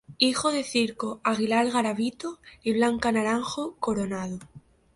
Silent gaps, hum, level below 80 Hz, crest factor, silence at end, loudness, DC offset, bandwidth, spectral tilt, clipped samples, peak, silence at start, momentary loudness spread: none; none; -58 dBFS; 20 dB; 0.35 s; -26 LUFS; under 0.1%; 11.5 kHz; -4 dB/octave; under 0.1%; -6 dBFS; 0.1 s; 10 LU